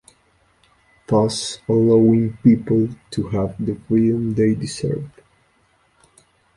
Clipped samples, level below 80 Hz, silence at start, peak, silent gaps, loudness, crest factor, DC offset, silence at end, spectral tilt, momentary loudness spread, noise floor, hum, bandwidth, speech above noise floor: under 0.1%; -50 dBFS; 1.1 s; -2 dBFS; none; -19 LUFS; 18 dB; under 0.1%; 1.45 s; -7 dB/octave; 11 LU; -60 dBFS; none; 11.5 kHz; 43 dB